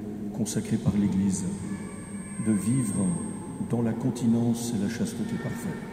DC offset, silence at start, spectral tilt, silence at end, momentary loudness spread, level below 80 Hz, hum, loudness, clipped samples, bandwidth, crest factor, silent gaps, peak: under 0.1%; 0 s; -6 dB/octave; 0 s; 10 LU; -54 dBFS; none; -28 LUFS; under 0.1%; 15.5 kHz; 16 dB; none; -12 dBFS